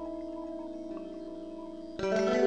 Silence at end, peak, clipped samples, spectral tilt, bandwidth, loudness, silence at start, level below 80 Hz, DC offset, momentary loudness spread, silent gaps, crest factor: 0 s; -14 dBFS; under 0.1%; -5.5 dB/octave; 9.4 kHz; -37 LUFS; 0 s; -60 dBFS; 0.2%; 13 LU; none; 20 dB